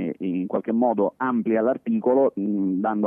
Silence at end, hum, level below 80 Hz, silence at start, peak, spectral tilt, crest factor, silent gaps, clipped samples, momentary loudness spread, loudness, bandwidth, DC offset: 0 s; none; -74 dBFS; 0 s; -10 dBFS; -11 dB/octave; 14 dB; none; under 0.1%; 5 LU; -23 LUFS; 3.5 kHz; under 0.1%